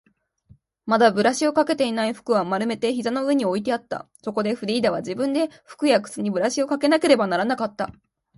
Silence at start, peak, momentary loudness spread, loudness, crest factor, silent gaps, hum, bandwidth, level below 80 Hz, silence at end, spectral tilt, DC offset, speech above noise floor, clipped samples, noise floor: 0.85 s; -4 dBFS; 10 LU; -22 LUFS; 20 dB; none; none; 11.5 kHz; -64 dBFS; 0.45 s; -4.5 dB/octave; under 0.1%; 34 dB; under 0.1%; -56 dBFS